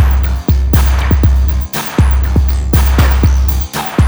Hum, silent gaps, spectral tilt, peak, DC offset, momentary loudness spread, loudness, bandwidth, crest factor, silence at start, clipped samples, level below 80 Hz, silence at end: none; none; -6 dB/octave; 0 dBFS; under 0.1%; 5 LU; -12 LUFS; over 20 kHz; 10 dB; 0 s; under 0.1%; -12 dBFS; 0 s